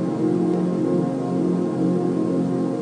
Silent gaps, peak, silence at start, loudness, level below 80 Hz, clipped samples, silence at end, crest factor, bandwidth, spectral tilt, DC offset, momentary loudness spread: none; -10 dBFS; 0 s; -22 LUFS; -62 dBFS; under 0.1%; 0 s; 12 dB; 9.8 kHz; -9 dB/octave; under 0.1%; 2 LU